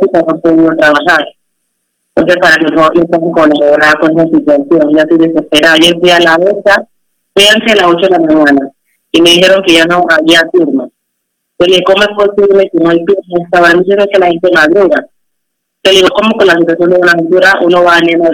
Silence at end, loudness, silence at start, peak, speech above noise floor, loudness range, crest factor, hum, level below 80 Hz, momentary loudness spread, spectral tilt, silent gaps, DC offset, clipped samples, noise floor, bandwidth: 0 s; -6 LUFS; 0 s; 0 dBFS; 62 dB; 2 LU; 8 dB; none; -44 dBFS; 6 LU; -4 dB/octave; none; under 0.1%; 1%; -68 dBFS; 18 kHz